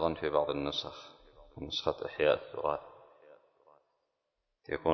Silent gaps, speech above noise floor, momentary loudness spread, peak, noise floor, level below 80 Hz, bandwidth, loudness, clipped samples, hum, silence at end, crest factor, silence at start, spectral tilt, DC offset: none; 51 dB; 24 LU; -12 dBFS; -84 dBFS; -58 dBFS; 6.2 kHz; -34 LUFS; under 0.1%; none; 0 s; 22 dB; 0 s; -3 dB/octave; under 0.1%